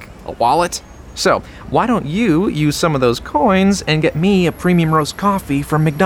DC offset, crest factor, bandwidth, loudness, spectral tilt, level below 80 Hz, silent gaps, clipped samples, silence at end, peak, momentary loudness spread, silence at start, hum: under 0.1%; 14 dB; over 20 kHz; -16 LUFS; -5.5 dB/octave; -38 dBFS; none; under 0.1%; 0 s; -2 dBFS; 5 LU; 0 s; none